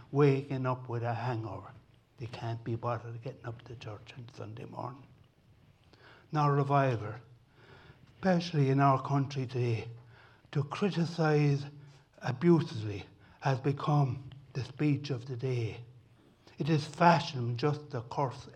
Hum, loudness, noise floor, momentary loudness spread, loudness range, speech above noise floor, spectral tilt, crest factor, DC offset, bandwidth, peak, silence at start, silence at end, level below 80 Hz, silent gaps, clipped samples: none; -32 LUFS; -63 dBFS; 18 LU; 10 LU; 32 dB; -7.5 dB/octave; 24 dB; under 0.1%; 8.6 kHz; -8 dBFS; 0 s; 0 s; -70 dBFS; none; under 0.1%